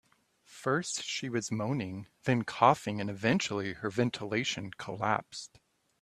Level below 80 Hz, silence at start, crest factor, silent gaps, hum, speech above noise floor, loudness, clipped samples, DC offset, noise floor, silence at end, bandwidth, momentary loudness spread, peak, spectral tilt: -68 dBFS; 0.5 s; 24 dB; none; none; 33 dB; -32 LUFS; under 0.1%; under 0.1%; -65 dBFS; 0.55 s; 13.5 kHz; 12 LU; -8 dBFS; -4.5 dB/octave